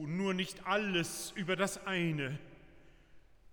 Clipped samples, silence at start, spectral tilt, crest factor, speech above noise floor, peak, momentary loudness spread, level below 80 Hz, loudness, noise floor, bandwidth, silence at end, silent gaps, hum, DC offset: under 0.1%; 0 s; -4.5 dB/octave; 18 dB; 24 dB; -18 dBFS; 6 LU; -64 dBFS; -35 LUFS; -59 dBFS; over 20 kHz; 0 s; none; none; under 0.1%